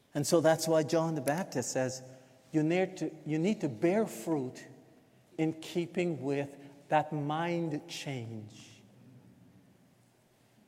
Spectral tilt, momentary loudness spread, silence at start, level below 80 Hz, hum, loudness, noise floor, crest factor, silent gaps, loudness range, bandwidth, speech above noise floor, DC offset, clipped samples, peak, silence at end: -5.5 dB/octave; 16 LU; 0.15 s; -80 dBFS; none; -32 LUFS; -66 dBFS; 20 dB; none; 5 LU; 16.5 kHz; 35 dB; under 0.1%; under 0.1%; -12 dBFS; 1.5 s